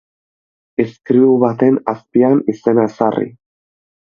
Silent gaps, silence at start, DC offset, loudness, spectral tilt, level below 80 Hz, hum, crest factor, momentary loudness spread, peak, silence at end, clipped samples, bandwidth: none; 0.8 s; under 0.1%; -15 LUFS; -9.5 dB/octave; -60 dBFS; none; 16 dB; 9 LU; 0 dBFS; 0.85 s; under 0.1%; 6.8 kHz